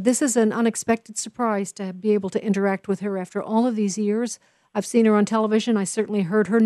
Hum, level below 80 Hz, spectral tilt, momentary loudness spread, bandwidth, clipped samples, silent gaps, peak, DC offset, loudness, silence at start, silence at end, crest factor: none; -70 dBFS; -5 dB/octave; 9 LU; 12 kHz; under 0.1%; none; -6 dBFS; under 0.1%; -22 LUFS; 0 s; 0 s; 16 dB